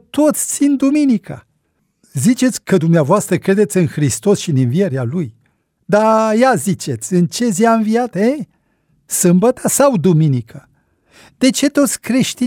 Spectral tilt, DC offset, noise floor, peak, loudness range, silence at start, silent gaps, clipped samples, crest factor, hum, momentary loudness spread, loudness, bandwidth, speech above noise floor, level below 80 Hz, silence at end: -5.5 dB/octave; under 0.1%; -65 dBFS; -2 dBFS; 1 LU; 0.15 s; none; under 0.1%; 14 dB; none; 8 LU; -14 LUFS; 17.5 kHz; 51 dB; -56 dBFS; 0 s